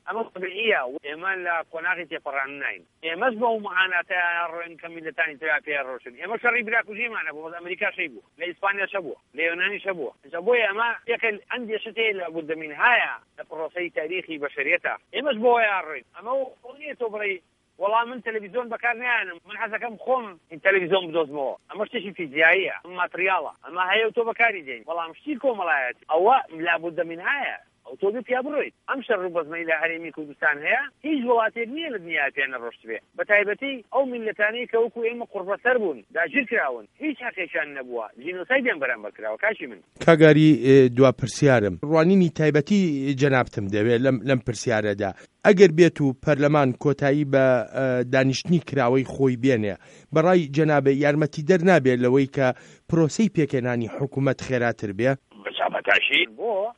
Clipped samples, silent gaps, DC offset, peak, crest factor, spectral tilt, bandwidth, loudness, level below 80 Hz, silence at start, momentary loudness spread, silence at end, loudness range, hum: under 0.1%; none; under 0.1%; 0 dBFS; 22 dB; -6 dB/octave; 11 kHz; -23 LUFS; -62 dBFS; 0.05 s; 12 LU; 0.05 s; 7 LU; none